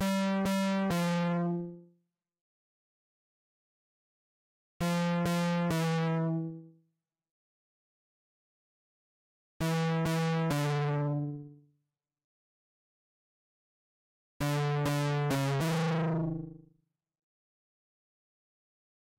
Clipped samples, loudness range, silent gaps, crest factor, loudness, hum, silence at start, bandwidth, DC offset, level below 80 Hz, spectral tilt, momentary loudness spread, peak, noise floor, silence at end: under 0.1%; 9 LU; 2.41-4.80 s, 7.31-9.60 s, 12.24-14.40 s; 14 dB; -31 LUFS; none; 0 s; 16 kHz; under 0.1%; -62 dBFS; -6.5 dB/octave; 7 LU; -20 dBFS; -83 dBFS; 2.6 s